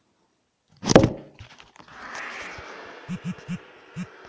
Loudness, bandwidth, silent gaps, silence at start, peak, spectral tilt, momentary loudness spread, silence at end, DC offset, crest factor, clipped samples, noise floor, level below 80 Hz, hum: -25 LUFS; 8 kHz; none; 0.8 s; 0 dBFS; -5 dB/octave; 27 LU; 0 s; under 0.1%; 28 dB; under 0.1%; -70 dBFS; -46 dBFS; none